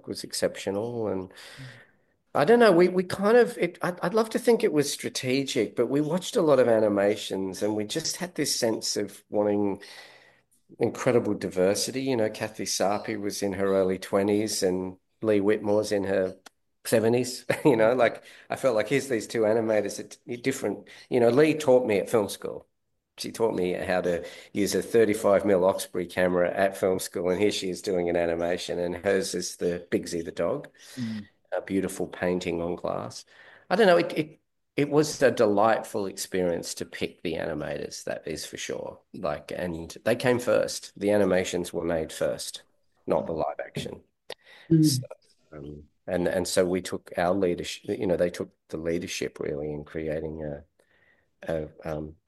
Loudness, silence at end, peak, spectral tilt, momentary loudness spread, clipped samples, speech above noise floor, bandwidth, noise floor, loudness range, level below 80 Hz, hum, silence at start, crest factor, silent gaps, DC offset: -26 LUFS; 0.15 s; -8 dBFS; -5 dB/octave; 14 LU; under 0.1%; 39 dB; 12.5 kHz; -65 dBFS; 6 LU; -60 dBFS; none; 0.05 s; 20 dB; none; under 0.1%